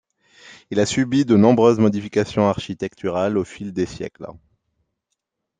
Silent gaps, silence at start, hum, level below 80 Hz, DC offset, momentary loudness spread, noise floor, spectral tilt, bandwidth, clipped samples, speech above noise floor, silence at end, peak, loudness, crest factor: none; 0.5 s; none; -56 dBFS; under 0.1%; 15 LU; -78 dBFS; -6.5 dB/octave; 9.4 kHz; under 0.1%; 59 dB; 1.3 s; -2 dBFS; -19 LUFS; 18 dB